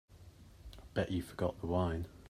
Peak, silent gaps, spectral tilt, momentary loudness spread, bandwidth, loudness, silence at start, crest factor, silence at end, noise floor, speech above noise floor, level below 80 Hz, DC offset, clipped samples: -20 dBFS; none; -7.5 dB/octave; 22 LU; 15 kHz; -37 LUFS; 0.1 s; 20 dB; 0 s; -57 dBFS; 21 dB; -56 dBFS; under 0.1%; under 0.1%